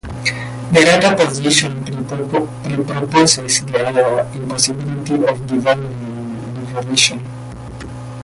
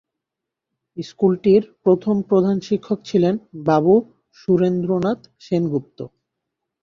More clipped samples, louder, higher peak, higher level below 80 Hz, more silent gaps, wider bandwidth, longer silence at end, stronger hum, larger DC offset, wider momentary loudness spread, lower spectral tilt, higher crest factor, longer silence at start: neither; first, -16 LUFS vs -19 LUFS; about the same, 0 dBFS vs -2 dBFS; first, -44 dBFS vs -60 dBFS; neither; first, 11.5 kHz vs 7.2 kHz; second, 0 s vs 0.75 s; neither; neither; about the same, 15 LU vs 17 LU; second, -3.5 dB/octave vs -8.5 dB/octave; about the same, 16 dB vs 16 dB; second, 0.05 s vs 0.95 s